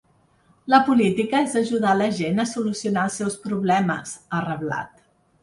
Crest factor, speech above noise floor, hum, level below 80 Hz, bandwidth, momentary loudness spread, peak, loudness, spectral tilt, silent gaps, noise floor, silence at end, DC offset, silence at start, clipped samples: 20 dB; 38 dB; none; -62 dBFS; 11.5 kHz; 10 LU; -2 dBFS; -22 LUFS; -5.5 dB/octave; none; -60 dBFS; 0.55 s; under 0.1%; 0.65 s; under 0.1%